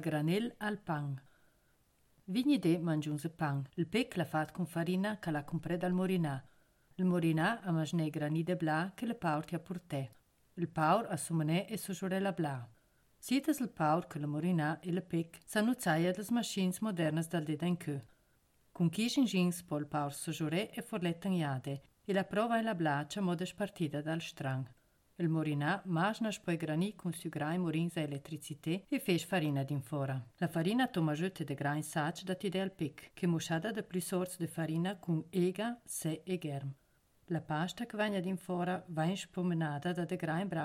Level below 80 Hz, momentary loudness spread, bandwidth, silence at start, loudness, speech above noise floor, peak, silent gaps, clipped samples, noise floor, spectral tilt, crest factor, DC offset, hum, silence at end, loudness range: -72 dBFS; 8 LU; 16 kHz; 0 s; -36 LUFS; 37 dB; -18 dBFS; none; under 0.1%; -72 dBFS; -6 dB/octave; 18 dB; under 0.1%; none; 0 s; 2 LU